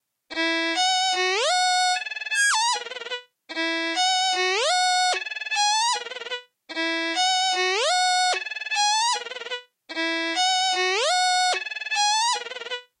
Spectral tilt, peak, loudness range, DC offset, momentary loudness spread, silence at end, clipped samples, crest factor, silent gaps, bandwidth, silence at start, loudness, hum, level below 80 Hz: 3 dB/octave; -12 dBFS; 1 LU; under 0.1%; 12 LU; 0.2 s; under 0.1%; 12 dB; none; 12 kHz; 0.3 s; -22 LUFS; none; -84 dBFS